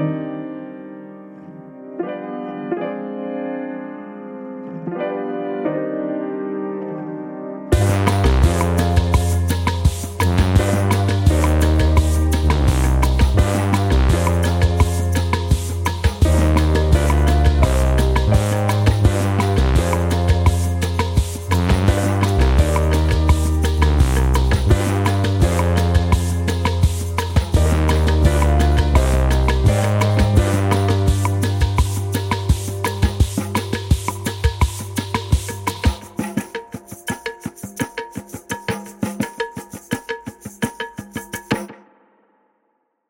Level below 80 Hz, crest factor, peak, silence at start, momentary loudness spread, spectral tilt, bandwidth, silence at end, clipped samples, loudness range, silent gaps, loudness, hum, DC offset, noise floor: -22 dBFS; 16 dB; -2 dBFS; 0 s; 14 LU; -6 dB/octave; 17 kHz; 1.35 s; under 0.1%; 11 LU; none; -18 LUFS; none; under 0.1%; -68 dBFS